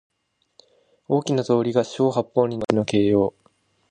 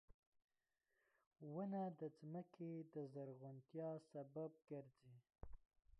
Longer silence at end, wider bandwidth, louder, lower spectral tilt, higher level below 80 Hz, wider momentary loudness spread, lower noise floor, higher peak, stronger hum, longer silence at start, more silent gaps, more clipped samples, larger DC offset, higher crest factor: first, 0.6 s vs 0.05 s; about the same, 9.6 kHz vs 9.6 kHz; first, -22 LUFS vs -53 LUFS; second, -6.5 dB/octave vs -10 dB/octave; first, -56 dBFS vs -74 dBFS; second, 4 LU vs 17 LU; second, -63 dBFS vs under -90 dBFS; first, -2 dBFS vs -38 dBFS; neither; first, 1.1 s vs 0.1 s; second, none vs 0.14-0.32 s, 0.44-0.48 s, 1.27-1.31 s; neither; neither; about the same, 20 dB vs 16 dB